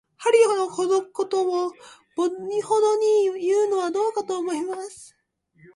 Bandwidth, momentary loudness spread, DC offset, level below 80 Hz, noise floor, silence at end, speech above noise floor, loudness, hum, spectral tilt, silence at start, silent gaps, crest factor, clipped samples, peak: 11.5 kHz; 11 LU; under 0.1%; -74 dBFS; -57 dBFS; 0.7 s; 35 dB; -23 LUFS; none; -3.5 dB/octave; 0.2 s; none; 16 dB; under 0.1%; -6 dBFS